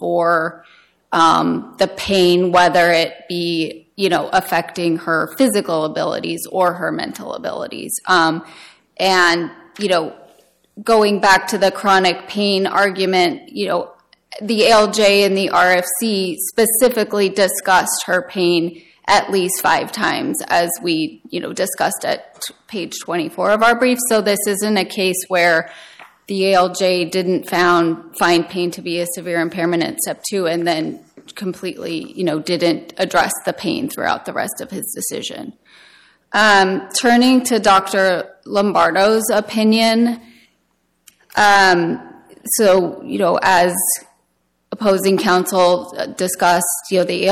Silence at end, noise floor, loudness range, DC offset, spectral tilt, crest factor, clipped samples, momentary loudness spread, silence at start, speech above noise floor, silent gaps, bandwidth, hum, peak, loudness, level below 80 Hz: 0 s; -66 dBFS; 6 LU; under 0.1%; -3.5 dB/octave; 14 dB; under 0.1%; 13 LU; 0 s; 49 dB; none; 16.5 kHz; none; -2 dBFS; -16 LUFS; -56 dBFS